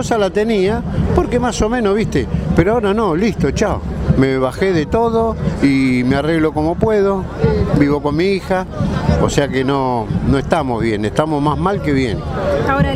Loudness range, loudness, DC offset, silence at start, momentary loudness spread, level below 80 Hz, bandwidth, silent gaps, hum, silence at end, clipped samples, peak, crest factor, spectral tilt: 1 LU; -16 LUFS; under 0.1%; 0 s; 4 LU; -28 dBFS; 13 kHz; none; none; 0 s; under 0.1%; 0 dBFS; 14 dB; -7 dB/octave